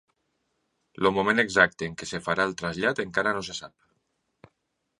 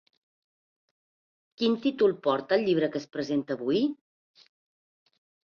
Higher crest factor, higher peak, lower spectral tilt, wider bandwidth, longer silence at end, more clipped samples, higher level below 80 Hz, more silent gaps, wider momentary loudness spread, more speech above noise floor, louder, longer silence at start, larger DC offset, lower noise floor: about the same, 24 dB vs 20 dB; first, -4 dBFS vs -10 dBFS; second, -4 dB/octave vs -6.5 dB/octave; first, 11.5 kHz vs 7 kHz; second, 1.3 s vs 1.55 s; neither; first, -60 dBFS vs -72 dBFS; neither; first, 12 LU vs 6 LU; second, 52 dB vs over 64 dB; about the same, -25 LUFS vs -27 LUFS; second, 1 s vs 1.6 s; neither; second, -78 dBFS vs under -90 dBFS